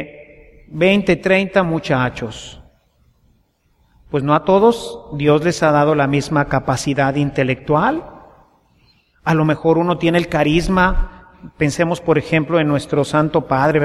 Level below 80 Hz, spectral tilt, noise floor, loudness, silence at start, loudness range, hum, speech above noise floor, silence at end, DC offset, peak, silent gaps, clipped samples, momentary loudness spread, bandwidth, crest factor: -34 dBFS; -6.5 dB/octave; -60 dBFS; -16 LUFS; 0 s; 4 LU; none; 44 dB; 0 s; under 0.1%; -2 dBFS; none; under 0.1%; 11 LU; 13 kHz; 16 dB